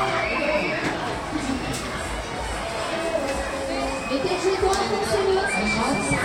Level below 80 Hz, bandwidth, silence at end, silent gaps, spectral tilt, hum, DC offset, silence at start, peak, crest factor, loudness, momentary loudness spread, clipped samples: -40 dBFS; 16.5 kHz; 0 s; none; -4 dB/octave; none; under 0.1%; 0 s; -10 dBFS; 14 dB; -24 LUFS; 7 LU; under 0.1%